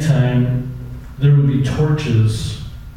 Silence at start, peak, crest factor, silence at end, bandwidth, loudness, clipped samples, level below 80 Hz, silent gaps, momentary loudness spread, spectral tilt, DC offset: 0 s; -4 dBFS; 12 dB; 0 s; 11 kHz; -16 LUFS; under 0.1%; -34 dBFS; none; 16 LU; -7.5 dB/octave; under 0.1%